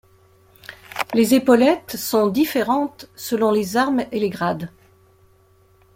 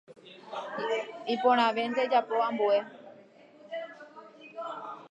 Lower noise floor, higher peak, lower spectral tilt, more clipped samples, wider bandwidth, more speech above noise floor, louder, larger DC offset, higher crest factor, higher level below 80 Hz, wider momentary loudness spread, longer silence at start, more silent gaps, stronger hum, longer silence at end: about the same, -55 dBFS vs -55 dBFS; first, -2 dBFS vs -12 dBFS; about the same, -5 dB/octave vs -4.5 dB/octave; neither; first, 16.5 kHz vs 9.2 kHz; first, 37 dB vs 28 dB; first, -19 LUFS vs -29 LUFS; neither; about the same, 18 dB vs 20 dB; first, -60 dBFS vs -90 dBFS; second, 17 LU vs 23 LU; first, 0.7 s vs 0.1 s; neither; neither; first, 1.3 s vs 0.05 s